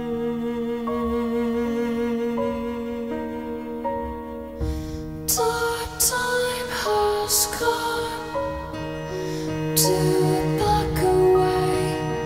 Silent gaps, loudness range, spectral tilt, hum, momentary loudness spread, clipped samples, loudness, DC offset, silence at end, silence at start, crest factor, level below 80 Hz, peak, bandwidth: none; 6 LU; -4 dB/octave; none; 11 LU; under 0.1%; -23 LUFS; under 0.1%; 0 s; 0 s; 20 dB; -40 dBFS; -4 dBFS; 16 kHz